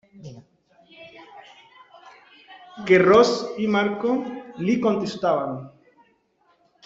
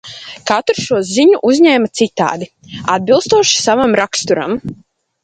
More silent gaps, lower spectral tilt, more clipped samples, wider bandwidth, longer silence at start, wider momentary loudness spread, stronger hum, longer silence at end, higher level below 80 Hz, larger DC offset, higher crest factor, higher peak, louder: neither; first, -6 dB/octave vs -3.5 dB/octave; neither; second, 7.8 kHz vs 9.4 kHz; first, 0.2 s vs 0.05 s; first, 28 LU vs 14 LU; neither; first, 1.15 s vs 0.5 s; second, -62 dBFS vs -52 dBFS; neither; first, 20 dB vs 14 dB; second, -4 dBFS vs 0 dBFS; second, -21 LUFS vs -13 LUFS